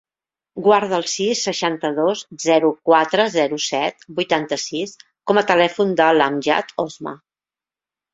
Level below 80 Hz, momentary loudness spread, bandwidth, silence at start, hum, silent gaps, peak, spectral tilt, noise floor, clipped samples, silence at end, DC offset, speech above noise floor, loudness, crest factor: -64 dBFS; 11 LU; 8 kHz; 0.55 s; none; none; 0 dBFS; -3.5 dB/octave; under -90 dBFS; under 0.1%; 0.95 s; under 0.1%; over 72 dB; -18 LUFS; 20 dB